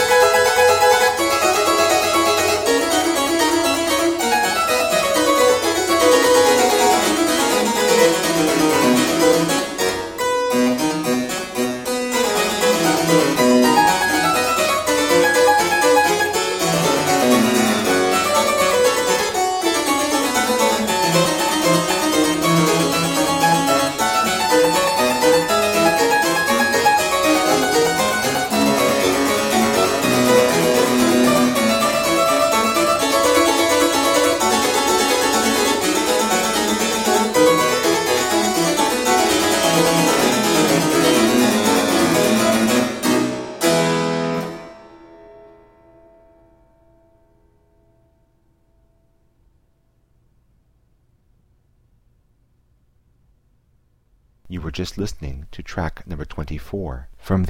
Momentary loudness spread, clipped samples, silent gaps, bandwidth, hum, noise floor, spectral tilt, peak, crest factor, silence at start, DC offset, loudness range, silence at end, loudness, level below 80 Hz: 7 LU; under 0.1%; none; 16.5 kHz; none; -61 dBFS; -3 dB/octave; 0 dBFS; 16 dB; 0 s; under 0.1%; 5 LU; 0 s; -16 LUFS; -46 dBFS